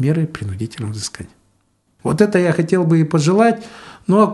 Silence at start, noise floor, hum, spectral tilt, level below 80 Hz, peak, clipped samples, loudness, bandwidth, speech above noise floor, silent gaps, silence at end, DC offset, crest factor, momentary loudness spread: 0 s; -62 dBFS; none; -6.5 dB/octave; -54 dBFS; 0 dBFS; under 0.1%; -17 LUFS; 11.5 kHz; 46 dB; none; 0 s; under 0.1%; 16 dB; 13 LU